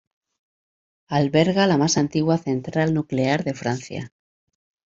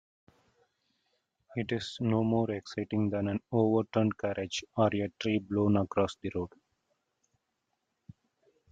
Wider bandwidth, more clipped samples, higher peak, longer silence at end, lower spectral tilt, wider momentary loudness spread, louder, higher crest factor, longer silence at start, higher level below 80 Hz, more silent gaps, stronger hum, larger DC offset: second, 7.8 kHz vs 8.6 kHz; neither; first, -2 dBFS vs -12 dBFS; second, 0.85 s vs 2.25 s; about the same, -5.5 dB/octave vs -6.5 dB/octave; about the same, 11 LU vs 9 LU; first, -21 LUFS vs -31 LUFS; about the same, 20 dB vs 20 dB; second, 1.1 s vs 1.5 s; first, -58 dBFS vs -68 dBFS; neither; neither; neither